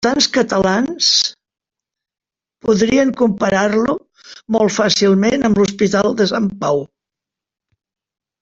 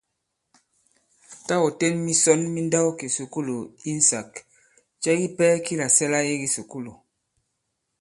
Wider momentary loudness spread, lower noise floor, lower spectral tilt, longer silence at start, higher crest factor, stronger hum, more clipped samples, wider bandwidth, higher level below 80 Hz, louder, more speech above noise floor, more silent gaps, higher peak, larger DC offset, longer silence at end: second, 7 LU vs 16 LU; first, -86 dBFS vs -78 dBFS; about the same, -4 dB/octave vs -3.5 dB/octave; second, 0 s vs 1.3 s; second, 16 dB vs 22 dB; neither; neither; second, 7.8 kHz vs 11.5 kHz; first, -50 dBFS vs -68 dBFS; first, -15 LUFS vs -22 LUFS; first, 71 dB vs 55 dB; neither; first, 0 dBFS vs -4 dBFS; neither; first, 1.55 s vs 1.1 s